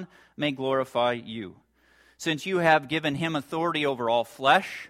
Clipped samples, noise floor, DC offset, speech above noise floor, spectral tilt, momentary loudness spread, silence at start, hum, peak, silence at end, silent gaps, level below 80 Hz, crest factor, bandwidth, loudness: under 0.1%; -61 dBFS; under 0.1%; 35 dB; -5 dB/octave; 12 LU; 0 s; none; -6 dBFS; 0 s; none; -68 dBFS; 20 dB; 16 kHz; -26 LUFS